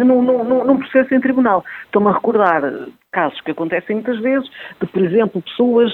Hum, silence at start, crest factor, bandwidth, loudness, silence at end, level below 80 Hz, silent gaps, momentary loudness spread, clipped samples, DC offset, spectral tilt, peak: none; 0 s; 16 dB; 4.2 kHz; -16 LUFS; 0 s; -60 dBFS; none; 9 LU; under 0.1%; under 0.1%; -9 dB/octave; 0 dBFS